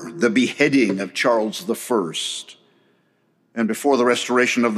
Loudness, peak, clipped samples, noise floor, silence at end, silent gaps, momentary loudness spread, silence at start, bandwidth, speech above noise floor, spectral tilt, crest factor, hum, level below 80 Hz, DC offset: -20 LUFS; -2 dBFS; under 0.1%; -64 dBFS; 0 s; none; 9 LU; 0 s; 15 kHz; 45 dB; -4 dB/octave; 18 dB; none; -78 dBFS; under 0.1%